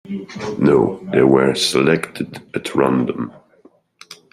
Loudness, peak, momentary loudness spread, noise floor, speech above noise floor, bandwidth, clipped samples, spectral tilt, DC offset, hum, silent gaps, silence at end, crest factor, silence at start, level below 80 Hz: -17 LUFS; 0 dBFS; 14 LU; -52 dBFS; 35 dB; 15 kHz; under 0.1%; -5.5 dB/octave; under 0.1%; none; none; 0.2 s; 18 dB; 0.05 s; -52 dBFS